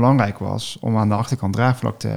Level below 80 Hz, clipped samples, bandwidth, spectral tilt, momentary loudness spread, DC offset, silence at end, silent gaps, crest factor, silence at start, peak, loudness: -52 dBFS; under 0.1%; 13.5 kHz; -7 dB/octave; 7 LU; 0.5%; 0 s; none; 16 dB; 0 s; -2 dBFS; -20 LUFS